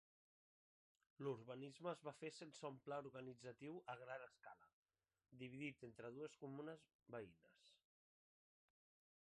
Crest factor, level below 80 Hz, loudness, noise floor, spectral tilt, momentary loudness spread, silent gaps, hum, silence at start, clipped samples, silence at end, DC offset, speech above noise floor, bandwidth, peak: 20 dB; under -90 dBFS; -55 LUFS; under -90 dBFS; -6 dB/octave; 7 LU; 4.73-4.86 s, 6.95-6.99 s; none; 1.2 s; under 0.1%; 1.5 s; under 0.1%; over 35 dB; 11 kHz; -36 dBFS